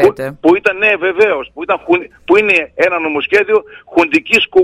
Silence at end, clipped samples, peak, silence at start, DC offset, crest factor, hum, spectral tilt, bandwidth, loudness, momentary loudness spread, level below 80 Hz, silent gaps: 0 s; under 0.1%; 0 dBFS; 0 s; under 0.1%; 12 dB; none; -4.5 dB/octave; 13.5 kHz; -12 LUFS; 6 LU; -50 dBFS; none